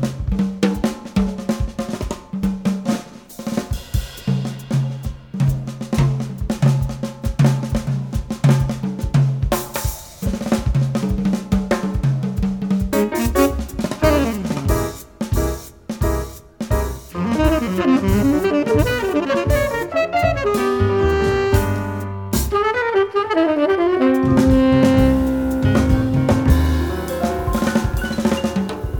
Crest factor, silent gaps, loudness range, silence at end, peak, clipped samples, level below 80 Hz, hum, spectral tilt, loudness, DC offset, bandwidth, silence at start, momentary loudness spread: 16 dB; none; 7 LU; 0 s; -2 dBFS; under 0.1%; -28 dBFS; none; -6.5 dB/octave; -19 LUFS; under 0.1%; 19 kHz; 0 s; 9 LU